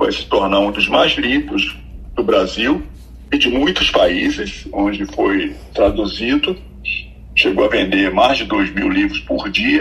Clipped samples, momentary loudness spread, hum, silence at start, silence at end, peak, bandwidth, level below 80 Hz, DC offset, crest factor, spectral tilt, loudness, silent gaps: under 0.1%; 9 LU; none; 0 s; 0 s; 0 dBFS; 12 kHz; -34 dBFS; under 0.1%; 16 dB; -4.5 dB/octave; -16 LUFS; none